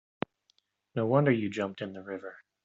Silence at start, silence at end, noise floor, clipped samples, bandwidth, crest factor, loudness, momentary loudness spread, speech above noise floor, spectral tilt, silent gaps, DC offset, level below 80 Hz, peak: 0.95 s; 0.3 s; -73 dBFS; under 0.1%; 7.8 kHz; 22 dB; -31 LUFS; 16 LU; 43 dB; -6.5 dB/octave; none; under 0.1%; -74 dBFS; -10 dBFS